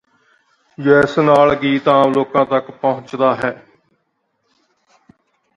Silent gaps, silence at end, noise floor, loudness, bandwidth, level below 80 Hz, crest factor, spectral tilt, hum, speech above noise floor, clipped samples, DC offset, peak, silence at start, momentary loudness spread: none; 2 s; -68 dBFS; -15 LUFS; 10.5 kHz; -54 dBFS; 18 dB; -7 dB/octave; none; 54 dB; under 0.1%; under 0.1%; 0 dBFS; 0.8 s; 10 LU